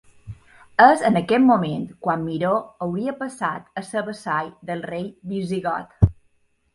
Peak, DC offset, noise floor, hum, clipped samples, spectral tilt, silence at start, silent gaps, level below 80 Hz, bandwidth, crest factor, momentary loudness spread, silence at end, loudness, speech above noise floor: 0 dBFS; under 0.1%; -63 dBFS; none; under 0.1%; -7 dB/octave; 0.25 s; none; -40 dBFS; 11.5 kHz; 22 dB; 14 LU; 0.6 s; -22 LUFS; 42 dB